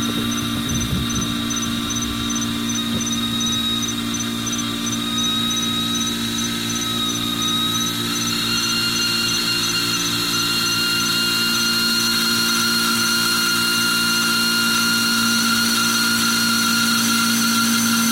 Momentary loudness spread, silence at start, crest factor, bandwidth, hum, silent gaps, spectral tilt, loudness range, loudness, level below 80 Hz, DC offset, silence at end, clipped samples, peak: 5 LU; 0 s; 14 dB; 16.5 kHz; none; none; -1.5 dB/octave; 5 LU; -18 LUFS; -44 dBFS; 0.2%; 0 s; under 0.1%; -6 dBFS